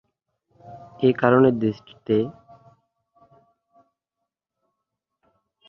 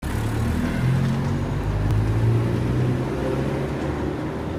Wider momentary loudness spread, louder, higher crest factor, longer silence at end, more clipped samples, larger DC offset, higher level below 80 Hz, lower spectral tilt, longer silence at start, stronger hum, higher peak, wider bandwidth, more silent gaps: first, 23 LU vs 5 LU; about the same, -21 LUFS vs -23 LUFS; first, 24 dB vs 12 dB; first, 3.35 s vs 0 s; neither; neither; second, -64 dBFS vs -32 dBFS; first, -9.5 dB/octave vs -7.5 dB/octave; first, 0.7 s vs 0 s; neither; first, -2 dBFS vs -10 dBFS; second, 5.8 kHz vs 15.5 kHz; neither